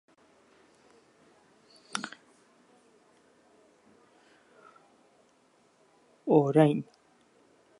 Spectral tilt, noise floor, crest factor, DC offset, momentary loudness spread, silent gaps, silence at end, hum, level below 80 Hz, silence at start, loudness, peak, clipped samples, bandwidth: -7 dB/octave; -66 dBFS; 26 dB; under 0.1%; 24 LU; none; 1 s; none; -84 dBFS; 1.95 s; -27 LUFS; -8 dBFS; under 0.1%; 11.5 kHz